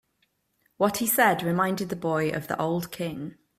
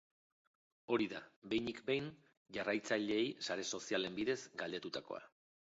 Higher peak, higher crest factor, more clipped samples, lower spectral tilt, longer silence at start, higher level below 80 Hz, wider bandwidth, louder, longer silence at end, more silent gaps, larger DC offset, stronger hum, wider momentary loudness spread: first, -6 dBFS vs -22 dBFS; about the same, 20 dB vs 20 dB; neither; first, -4.5 dB/octave vs -3 dB/octave; about the same, 0.8 s vs 0.9 s; first, -64 dBFS vs -76 dBFS; first, 16 kHz vs 7.6 kHz; first, -26 LUFS vs -40 LUFS; second, 0.25 s vs 0.5 s; second, none vs 1.36-1.42 s, 2.37-2.45 s; neither; neither; about the same, 12 LU vs 10 LU